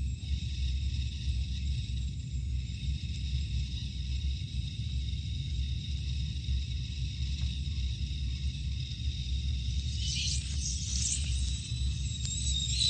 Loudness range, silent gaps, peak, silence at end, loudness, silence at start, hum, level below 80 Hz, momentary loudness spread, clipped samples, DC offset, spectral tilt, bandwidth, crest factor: 3 LU; none; -16 dBFS; 0 s; -34 LUFS; 0 s; none; -34 dBFS; 5 LU; under 0.1%; under 0.1%; -3 dB/octave; 9.4 kHz; 16 dB